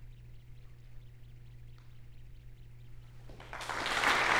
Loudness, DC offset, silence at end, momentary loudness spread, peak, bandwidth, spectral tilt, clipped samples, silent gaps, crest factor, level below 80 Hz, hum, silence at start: -32 LUFS; under 0.1%; 0 s; 26 LU; -16 dBFS; over 20 kHz; -2.5 dB/octave; under 0.1%; none; 22 dB; -54 dBFS; none; 0 s